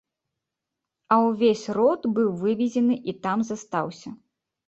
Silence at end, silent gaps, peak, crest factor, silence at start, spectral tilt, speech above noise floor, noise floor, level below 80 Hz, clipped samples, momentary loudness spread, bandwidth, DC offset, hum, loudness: 0.5 s; none; -8 dBFS; 18 dB; 1.1 s; -6.5 dB/octave; 62 dB; -85 dBFS; -68 dBFS; under 0.1%; 8 LU; 8 kHz; under 0.1%; none; -24 LUFS